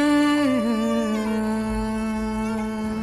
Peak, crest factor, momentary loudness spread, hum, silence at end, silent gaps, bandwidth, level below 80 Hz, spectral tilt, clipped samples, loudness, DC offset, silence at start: -10 dBFS; 12 dB; 7 LU; none; 0 s; none; 14 kHz; -40 dBFS; -5.5 dB/octave; under 0.1%; -23 LUFS; under 0.1%; 0 s